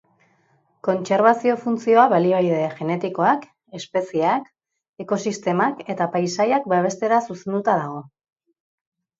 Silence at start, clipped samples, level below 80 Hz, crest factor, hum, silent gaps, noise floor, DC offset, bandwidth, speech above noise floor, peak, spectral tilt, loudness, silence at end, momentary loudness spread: 0.85 s; under 0.1%; -70 dBFS; 20 dB; none; 4.89-4.94 s; -63 dBFS; under 0.1%; 8 kHz; 43 dB; -2 dBFS; -6 dB/octave; -21 LUFS; 1.15 s; 10 LU